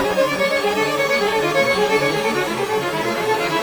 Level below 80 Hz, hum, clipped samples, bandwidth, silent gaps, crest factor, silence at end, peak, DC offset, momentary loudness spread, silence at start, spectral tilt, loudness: -52 dBFS; none; under 0.1%; over 20 kHz; none; 14 dB; 0 s; -4 dBFS; under 0.1%; 4 LU; 0 s; -3.5 dB/octave; -18 LUFS